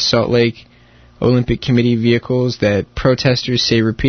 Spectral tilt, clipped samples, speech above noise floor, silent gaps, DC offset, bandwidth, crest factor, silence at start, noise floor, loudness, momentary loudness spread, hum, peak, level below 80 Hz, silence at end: -6 dB/octave; under 0.1%; 31 dB; none; under 0.1%; 6.6 kHz; 14 dB; 0 s; -46 dBFS; -15 LUFS; 3 LU; none; 0 dBFS; -36 dBFS; 0 s